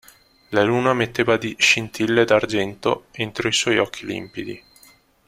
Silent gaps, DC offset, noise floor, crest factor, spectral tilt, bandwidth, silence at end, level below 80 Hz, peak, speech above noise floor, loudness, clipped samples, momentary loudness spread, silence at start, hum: none; under 0.1%; -53 dBFS; 20 dB; -3.5 dB/octave; 15.5 kHz; 0.7 s; -56 dBFS; -2 dBFS; 33 dB; -20 LUFS; under 0.1%; 13 LU; 0.5 s; none